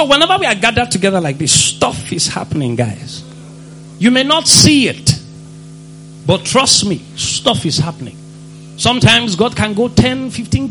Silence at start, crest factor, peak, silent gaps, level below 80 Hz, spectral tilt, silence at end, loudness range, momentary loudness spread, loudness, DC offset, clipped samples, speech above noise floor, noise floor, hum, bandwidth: 0 s; 14 dB; 0 dBFS; none; -38 dBFS; -3.5 dB/octave; 0 s; 4 LU; 12 LU; -12 LUFS; under 0.1%; 0.2%; 21 dB; -34 dBFS; none; over 20 kHz